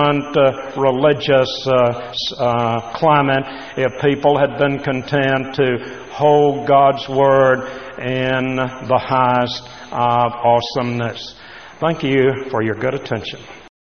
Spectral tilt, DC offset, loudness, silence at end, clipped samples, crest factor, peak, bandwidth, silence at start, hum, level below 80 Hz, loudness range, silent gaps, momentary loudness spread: -4 dB/octave; 0.4%; -17 LUFS; 0.3 s; under 0.1%; 16 dB; 0 dBFS; 6.6 kHz; 0 s; none; -52 dBFS; 3 LU; none; 11 LU